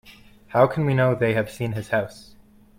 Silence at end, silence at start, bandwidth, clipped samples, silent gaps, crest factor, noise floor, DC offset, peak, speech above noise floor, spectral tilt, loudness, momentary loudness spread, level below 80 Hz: 0.55 s; 0.1 s; 16 kHz; under 0.1%; none; 20 dB; -48 dBFS; under 0.1%; -4 dBFS; 27 dB; -7.5 dB/octave; -22 LUFS; 9 LU; -54 dBFS